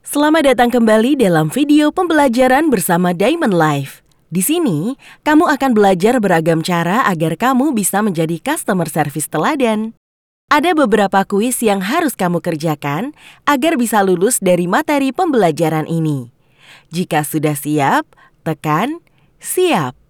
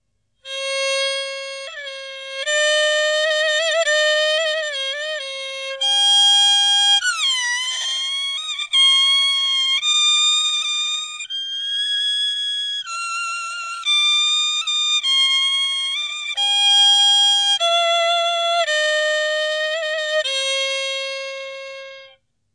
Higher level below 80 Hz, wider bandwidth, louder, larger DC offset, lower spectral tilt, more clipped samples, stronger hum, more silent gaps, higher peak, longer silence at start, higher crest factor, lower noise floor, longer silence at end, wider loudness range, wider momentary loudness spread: first, -50 dBFS vs -74 dBFS; first, over 20 kHz vs 11 kHz; about the same, -15 LUFS vs -16 LUFS; neither; first, -5 dB/octave vs 5.5 dB/octave; neither; neither; first, 9.97-10.48 s vs none; first, 0 dBFS vs -6 dBFS; second, 0.05 s vs 0.45 s; about the same, 14 dB vs 14 dB; second, -45 dBFS vs -51 dBFS; second, 0.2 s vs 0.5 s; about the same, 4 LU vs 6 LU; second, 9 LU vs 14 LU